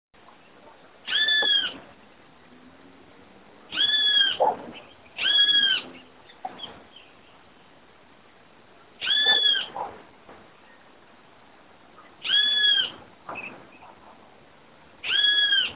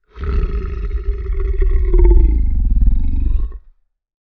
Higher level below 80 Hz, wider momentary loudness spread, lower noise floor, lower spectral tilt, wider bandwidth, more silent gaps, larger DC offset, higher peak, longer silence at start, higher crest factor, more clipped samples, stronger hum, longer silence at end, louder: second, -68 dBFS vs -14 dBFS; first, 23 LU vs 10 LU; first, -54 dBFS vs -50 dBFS; second, 3.5 dB/octave vs -11 dB/octave; first, 4 kHz vs 2.9 kHz; neither; first, 0.1% vs under 0.1%; second, -10 dBFS vs 0 dBFS; first, 1.05 s vs 0.15 s; about the same, 18 dB vs 14 dB; neither; neither; second, 0 s vs 0.7 s; about the same, -19 LUFS vs -19 LUFS